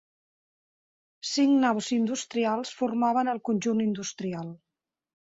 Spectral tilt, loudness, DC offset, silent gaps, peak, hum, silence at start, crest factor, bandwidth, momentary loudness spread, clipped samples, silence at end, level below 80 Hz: -4.5 dB/octave; -27 LUFS; under 0.1%; none; -12 dBFS; none; 1.25 s; 18 dB; 8 kHz; 11 LU; under 0.1%; 0.65 s; -72 dBFS